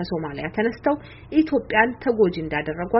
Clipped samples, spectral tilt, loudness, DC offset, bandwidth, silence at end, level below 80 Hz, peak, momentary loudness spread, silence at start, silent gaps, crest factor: under 0.1%; -4.5 dB/octave; -23 LUFS; under 0.1%; 5.8 kHz; 0 s; -48 dBFS; -4 dBFS; 8 LU; 0 s; none; 18 dB